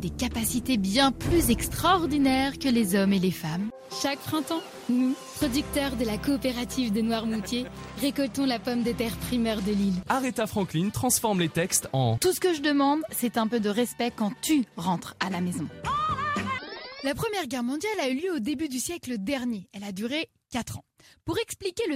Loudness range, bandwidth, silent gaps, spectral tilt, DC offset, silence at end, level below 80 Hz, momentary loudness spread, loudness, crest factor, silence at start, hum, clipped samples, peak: 5 LU; 16 kHz; none; -4.5 dB/octave; under 0.1%; 0 s; -46 dBFS; 9 LU; -27 LUFS; 18 dB; 0 s; none; under 0.1%; -10 dBFS